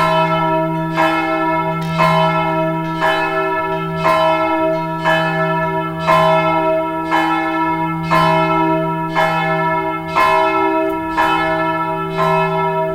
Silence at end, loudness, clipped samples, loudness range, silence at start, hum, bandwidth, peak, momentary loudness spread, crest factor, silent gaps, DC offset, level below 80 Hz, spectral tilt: 0 s; -16 LUFS; under 0.1%; 1 LU; 0 s; none; 17 kHz; -2 dBFS; 5 LU; 14 dB; none; under 0.1%; -46 dBFS; -6.5 dB/octave